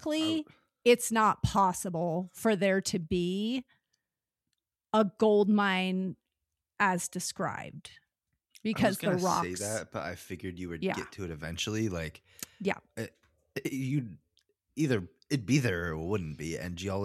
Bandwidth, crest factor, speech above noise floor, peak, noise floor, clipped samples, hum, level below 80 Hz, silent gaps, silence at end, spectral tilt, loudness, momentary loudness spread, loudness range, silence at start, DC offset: 14.5 kHz; 20 dB; 59 dB; -10 dBFS; -90 dBFS; under 0.1%; none; -56 dBFS; none; 0 s; -5 dB/octave; -31 LUFS; 14 LU; 7 LU; 0 s; under 0.1%